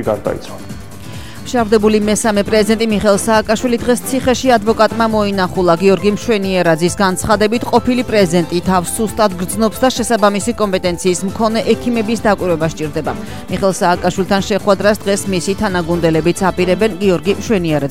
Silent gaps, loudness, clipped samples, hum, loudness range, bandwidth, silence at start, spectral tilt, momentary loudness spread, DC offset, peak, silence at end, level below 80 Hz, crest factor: none; -14 LUFS; under 0.1%; none; 2 LU; 16.5 kHz; 0 s; -5 dB/octave; 7 LU; 2%; 0 dBFS; 0 s; -38 dBFS; 14 dB